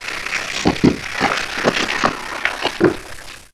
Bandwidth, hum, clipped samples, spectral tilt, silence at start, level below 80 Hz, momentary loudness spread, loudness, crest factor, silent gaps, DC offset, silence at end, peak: 15.5 kHz; none; under 0.1%; -4 dB/octave; 0 s; -40 dBFS; 6 LU; -18 LUFS; 20 dB; none; 0.8%; 0.05 s; 0 dBFS